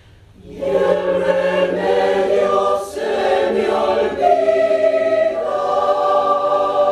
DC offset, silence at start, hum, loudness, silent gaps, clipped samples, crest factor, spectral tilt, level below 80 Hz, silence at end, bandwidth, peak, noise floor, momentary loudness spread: under 0.1%; 0.4 s; none; -17 LUFS; none; under 0.1%; 14 dB; -5 dB/octave; -50 dBFS; 0 s; 13 kHz; -2 dBFS; -42 dBFS; 4 LU